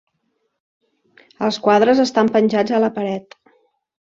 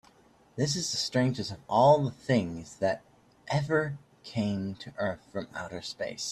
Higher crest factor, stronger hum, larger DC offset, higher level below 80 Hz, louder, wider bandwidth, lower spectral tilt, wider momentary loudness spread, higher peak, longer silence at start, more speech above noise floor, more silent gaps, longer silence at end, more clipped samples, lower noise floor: about the same, 18 dB vs 20 dB; neither; neither; about the same, -62 dBFS vs -64 dBFS; first, -17 LUFS vs -30 LUFS; second, 7.6 kHz vs 13.5 kHz; about the same, -5.5 dB/octave vs -5 dB/octave; second, 11 LU vs 15 LU; first, -2 dBFS vs -10 dBFS; first, 1.4 s vs 0.55 s; first, 54 dB vs 32 dB; neither; first, 0.95 s vs 0 s; neither; first, -70 dBFS vs -61 dBFS